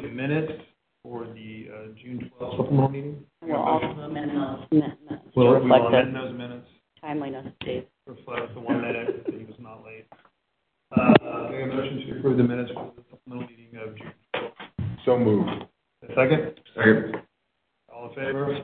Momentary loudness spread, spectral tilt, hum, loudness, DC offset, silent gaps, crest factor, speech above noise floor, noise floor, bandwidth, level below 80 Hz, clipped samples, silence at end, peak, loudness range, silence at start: 22 LU; -11.5 dB/octave; none; -24 LUFS; under 0.1%; none; 24 dB; 52 dB; -76 dBFS; 4.4 kHz; -60 dBFS; under 0.1%; 0 s; -2 dBFS; 9 LU; 0 s